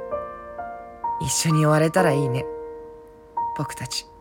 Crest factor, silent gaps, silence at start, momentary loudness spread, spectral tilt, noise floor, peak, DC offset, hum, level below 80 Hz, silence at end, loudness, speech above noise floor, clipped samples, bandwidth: 18 dB; none; 0 s; 17 LU; -5 dB/octave; -44 dBFS; -6 dBFS; under 0.1%; none; -52 dBFS; 0 s; -23 LUFS; 23 dB; under 0.1%; 17.5 kHz